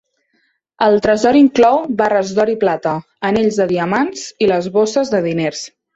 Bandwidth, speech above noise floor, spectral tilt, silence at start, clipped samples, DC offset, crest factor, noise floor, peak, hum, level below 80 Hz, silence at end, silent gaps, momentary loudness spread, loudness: 8 kHz; 49 dB; -5.5 dB/octave; 0.8 s; under 0.1%; under 0.1%; 14 dB; -63 dBFS; -2 dBFS; none; -52 dBFS; 0.25 s; none; 9 LU; -15 LUFS